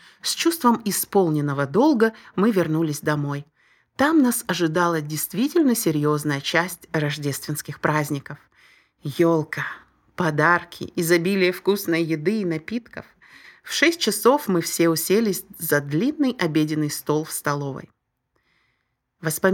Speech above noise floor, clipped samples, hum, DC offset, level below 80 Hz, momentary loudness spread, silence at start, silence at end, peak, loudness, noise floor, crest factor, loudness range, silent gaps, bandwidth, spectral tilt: 52 dB; under 0.1%; none; under 0.1%; -64 dBFS; 12 LU; 0.25 s; 0 s; -2 dBFS; -22 LUFS; -73 dBFS; 20 dB; 4 LU; none; 19 kHz; -4.5 dB/octave